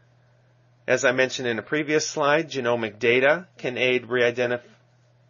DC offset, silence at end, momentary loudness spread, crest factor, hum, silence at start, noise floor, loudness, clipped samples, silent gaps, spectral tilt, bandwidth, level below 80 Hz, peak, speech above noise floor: under 0.1%; 0.7 s; 7 LU; 20 dB; none; 0.9 s; -59 dBFS; -23 LUFS; under 0.1%; none; -2.5 dB/octave; 7.2 kHz; -72 dBFS; -6 dBFS; 36 dB